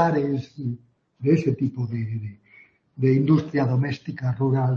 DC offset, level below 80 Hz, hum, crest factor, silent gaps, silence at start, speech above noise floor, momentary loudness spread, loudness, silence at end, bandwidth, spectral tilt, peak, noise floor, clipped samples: under 0.1%; -62 dBFS; none; 16 dB; none; 0 s; 32 dB; 12 LU; -24 LUFS; 0 s; 6.6 kHz; -9.5 dB/octave; -6 dBFS; -55 dBFS; under 0.1%